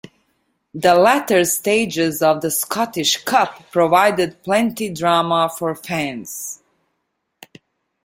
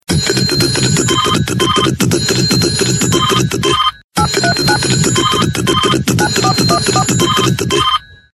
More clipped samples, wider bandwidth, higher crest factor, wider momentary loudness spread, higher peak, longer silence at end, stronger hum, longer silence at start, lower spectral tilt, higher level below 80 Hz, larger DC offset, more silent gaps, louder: neither; first, 16.5 kHz vs 13.5 kHz; first, 18 dB vs 12 dB; first, 12 LU vs 2 LU; about the same, -2 dBFS vs 0 dBFS; first, 1.5 s vs 0.35 s; neither; first, 0.75 s vs 0.1 s; about the same, -3.5 dB/octave vs -3.5 dB/octave; second, -60 dBFS vs -34 dBFS; neither; second, none vs 4.04-4.09 s; second, -17 LUFS vs -12 LUFS